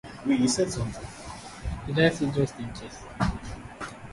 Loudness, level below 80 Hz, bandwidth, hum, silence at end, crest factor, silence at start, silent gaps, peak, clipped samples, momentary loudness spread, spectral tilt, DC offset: -27 LUFS; -42 dBFS; 11.5 kHz; none; 0 s; 22 dB; 0.05 s; none; -6 dBFS; under 0.1%; 17 LU; -5 dB/octave; under 0.1%